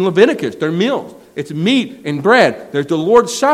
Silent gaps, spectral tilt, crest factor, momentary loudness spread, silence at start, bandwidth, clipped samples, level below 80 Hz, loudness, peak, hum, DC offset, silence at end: none; -5 dB/octave; 14 dB; 11 LU; 0 s; 15 kHz; 0.2%; -58 dBFS; -14 LUFS; 0 dBFS; none; under 0.1%; 0 s